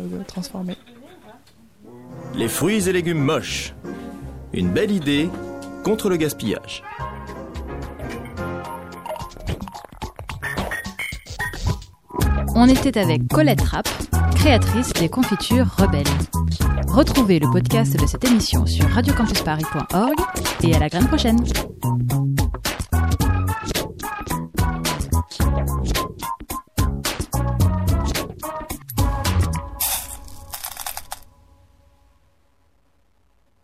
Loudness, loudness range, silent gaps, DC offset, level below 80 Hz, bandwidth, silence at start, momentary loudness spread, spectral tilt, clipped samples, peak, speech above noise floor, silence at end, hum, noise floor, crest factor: -21 LUFS; 11 LU; none; 0.1%; -30 dBFS; 16 kHz; 0 s; 15 LU; -5.5 dB/octave; under 0.1%; 0 dBFS; 45 dB; 2.45 s; none; -63 dBFS; 20 dB